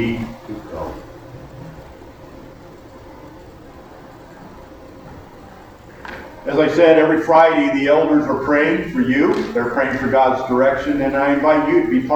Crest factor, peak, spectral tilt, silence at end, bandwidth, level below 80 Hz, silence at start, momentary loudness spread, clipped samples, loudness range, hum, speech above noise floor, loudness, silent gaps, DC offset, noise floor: 18 dB; 0 dBFS; -7 dB/octave; 0 s; 19 kHz; -44 dBFS; 0 s; 24 LU; under 0.1%; 21 LU; none; 25 dB; -15 LUFS; none; under 0.1%; -40 dBFS